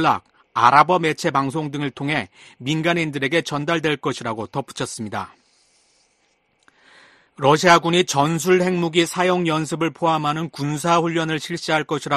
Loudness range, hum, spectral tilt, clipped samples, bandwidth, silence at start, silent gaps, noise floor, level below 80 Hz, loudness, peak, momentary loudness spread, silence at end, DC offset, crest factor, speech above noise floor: 9 LU; none; -4.5 dB/octave; under 0.1%; 13 kHz; 0 s; none; -65 dBFS; -60 dBFS; -20 LUFS; 0 dBFS; 13 LU; 0 s; under 0.1%; 20 dB; 45 dB